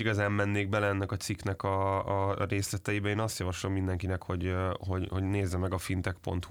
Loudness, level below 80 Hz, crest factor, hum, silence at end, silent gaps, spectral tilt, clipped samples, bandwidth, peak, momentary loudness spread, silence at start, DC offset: -32 LUFS; -56 dBFS; 16 dB; none; 0 s; none; -6 dB/octave; under 0.1%; 16.5 kHz; -16 dBFS; 5 LU; 0 s; under 0.1%